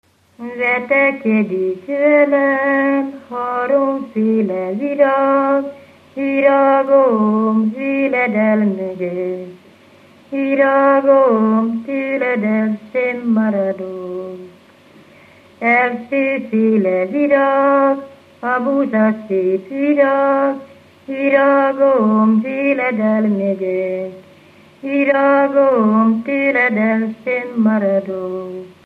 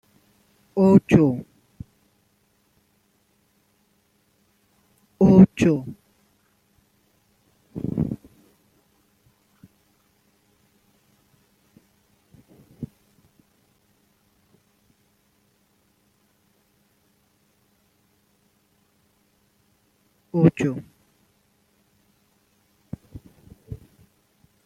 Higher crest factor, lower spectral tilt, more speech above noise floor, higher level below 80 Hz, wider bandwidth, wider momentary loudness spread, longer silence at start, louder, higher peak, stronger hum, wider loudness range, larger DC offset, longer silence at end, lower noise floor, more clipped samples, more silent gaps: second, 14 dB vs 26 dB; about the same, -9 dB/octave vs -9 dB/octave; second, 31 dB vs 47 dB; second, -70 dBFS vs -54 dBFS; second, 4.7 kHz vs 8.8 kHz; second, 12 LU vs 30 LU; second, 0.4 s vs 0.75 s; first, -15 LUFS vs -19 LUFS; about the same, -2 dBFS vs -2 dBFS; first, 50 Hz at -65 dBFS vs none; second, 4 LU vs 25 LU; neither; second, 0.15 s vs 0.9 s; second, -46 dBFS vs -66 dBFS; neither; neither